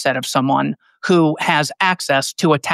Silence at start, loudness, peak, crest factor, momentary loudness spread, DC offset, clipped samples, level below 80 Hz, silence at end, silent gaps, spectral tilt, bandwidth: 0 s; -17 LUFS; -2 dBFS; 16 dB; 4 LU; under 0.1%; under 0.1%; -68 dBFS; 0 s; none; -4.5 dB/octave; 15.5 kHz